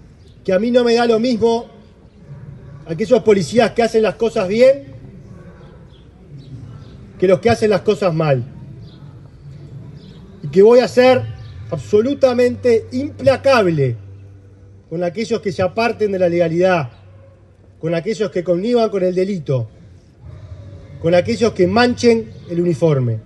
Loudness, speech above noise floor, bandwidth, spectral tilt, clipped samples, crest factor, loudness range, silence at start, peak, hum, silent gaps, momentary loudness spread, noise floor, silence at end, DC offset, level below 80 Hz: -16 LUFS; 31 dB; 11.5 kHz; -6.5 dB/octave; under 0.1%; 16 dB; 5 LU; 0.45 s; 0 dBFS; none; none; 23 LU; -46 dBFS; 0.05 s; under 0.1%; -48 dBFS